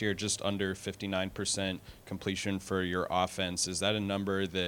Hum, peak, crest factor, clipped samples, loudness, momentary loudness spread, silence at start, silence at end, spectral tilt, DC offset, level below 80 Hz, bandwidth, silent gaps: none; -14 dBFS; 18 dB; under 0.1%; -33 LUFS; 6 LU; 0 s; 0 s; -3.5 dB/octave; under 0.1%; -60 dBFS; 19 kHz; none